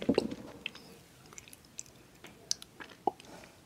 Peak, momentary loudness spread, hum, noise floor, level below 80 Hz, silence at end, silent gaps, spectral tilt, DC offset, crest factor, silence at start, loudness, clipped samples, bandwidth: -10 dBFS; 18 LU; none; -55 dBFS; -64 dBFS; 0.05 s; none; -3.5 dB/octave; under 0.1%; 30 dB; 0 s; -39 LUFS; under 0.1%; 16 kHz